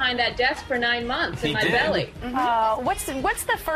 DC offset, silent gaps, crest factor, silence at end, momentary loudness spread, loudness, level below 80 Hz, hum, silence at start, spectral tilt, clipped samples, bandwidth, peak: under 0.1%; none; 16 dB; 0 s; 5 LU; -23 LUFS; -44 dBFS; none; 0 s; -3.5 dB/octave; under 0.1%; 15 kHz; -8 dBFS